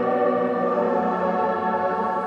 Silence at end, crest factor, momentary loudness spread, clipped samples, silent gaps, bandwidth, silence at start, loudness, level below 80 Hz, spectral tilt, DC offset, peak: 0 s; 12 dB; 2 LU; under 0.1%; none; 7.2 kHz; 0 s; -22 LUFS; -66 dBFS; -8 dB/octave; under 0.1%; -10 dBFS